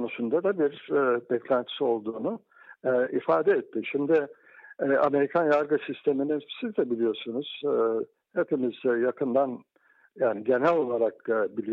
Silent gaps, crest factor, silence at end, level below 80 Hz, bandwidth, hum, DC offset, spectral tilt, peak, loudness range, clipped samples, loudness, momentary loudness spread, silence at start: none; 14 dB; 0 s; -76 dBFS; 5.8 kHz; none; under 0.1%; -8 dB/octave; -12 dBFS; 3 LU; under 0.1%; -27 LUFS; 9 LU; 0 s